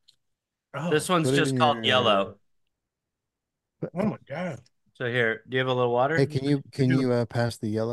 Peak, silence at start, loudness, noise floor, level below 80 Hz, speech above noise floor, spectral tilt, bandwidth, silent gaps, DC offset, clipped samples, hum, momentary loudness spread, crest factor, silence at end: -8 dBFS; 0.75 s; -25 LUFS; -85 dBFS; -64 dBFS; 60 dB; -5.5 dB/octave; 12.5 kHz; none; under 0.1%; under 0.1%; none; 12 LU; 18 dB; 0 s